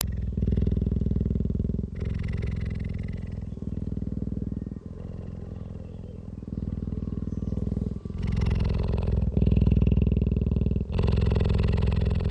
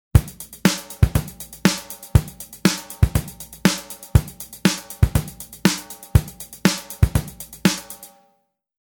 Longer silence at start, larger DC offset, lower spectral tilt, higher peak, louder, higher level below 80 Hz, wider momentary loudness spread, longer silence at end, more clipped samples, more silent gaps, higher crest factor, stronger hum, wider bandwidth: second, 0 s vs 0.15 s; neither; first, -8.5 dB/octave vs -5 dB/octave; second, -6 dBFS vs 0 dBFS; second, -28 LUFS vs -22 LUFS; about the same, -30 dBFS vs -30 dBFS; about the same, 14 LU vs 14 LU; second, 0 s vs 0.85 s; neither; neither; about the same, 22 dB vs 22 dB; neither; second, 6 kHz vs over 20 kHz